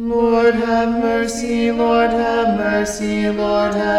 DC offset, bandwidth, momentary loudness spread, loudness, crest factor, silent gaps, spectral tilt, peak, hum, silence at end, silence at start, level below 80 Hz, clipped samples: under 0.1%; 13 kHz; 5 LU; -17 LUFS; 12 dB; none; -5 dB/octave; -4 dBFS; none; 0 s; 0 s; -40 dBFS; under 0.1%